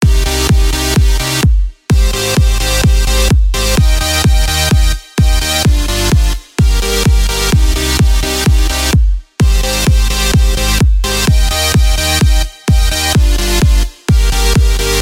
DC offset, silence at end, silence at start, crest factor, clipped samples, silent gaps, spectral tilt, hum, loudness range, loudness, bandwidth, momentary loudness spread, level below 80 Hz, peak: under 0.1%; 0 s; 0 s; 10 dB; under 0.1%; none; -4 dB/octave; none; 1 LU; -12 LUFS; 16.5 kHz; 2 LU; -12 dBFS; 0 dBFS